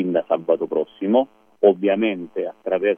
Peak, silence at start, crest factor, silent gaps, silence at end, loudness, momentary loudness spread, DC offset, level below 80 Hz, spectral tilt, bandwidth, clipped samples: -2 dBFS; 0 s; 18 dB; none; 0 s; -21 LUFS; 10 LU; under 0.1%; -72 dBFS; -9 dB/octave; 3.6 kHz; under 0.1%